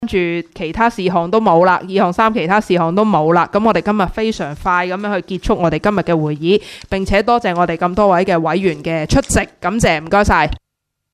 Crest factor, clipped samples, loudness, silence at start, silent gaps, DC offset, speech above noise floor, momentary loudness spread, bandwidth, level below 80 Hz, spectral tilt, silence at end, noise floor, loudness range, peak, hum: 14 dB; under 0.1%; -15 LUFS; 0 s; none; under 0.1%; 61 dB; 8 LU; 14 kHz; -32 dBFS; -5.5 dB/octave; 0.55 s; -76 dBFS; 3 LU; 0 dBFS; none